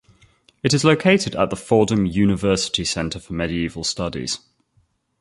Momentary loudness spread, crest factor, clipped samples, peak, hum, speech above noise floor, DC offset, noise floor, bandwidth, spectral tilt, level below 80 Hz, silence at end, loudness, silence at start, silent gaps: 10 LU; 18 dB; under 0.1%; -2 dBFS; none; 44 dB; under 0.1%; -64 dBFS; 11.5 kHz; -4.5 dB/octave; -44 dBFS; 0.85 s; -20 LUFS; 0.65 s; none